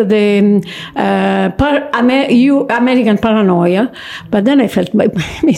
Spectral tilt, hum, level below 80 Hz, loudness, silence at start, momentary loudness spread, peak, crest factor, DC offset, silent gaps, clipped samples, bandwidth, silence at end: -7 dB/octave; none; -40 dBFS; -12 LUFS; 0 s; 6 LU; -2 dBFS; 10 dB; under 0.1%; none; under 0.1%; 13 kHz; 0 s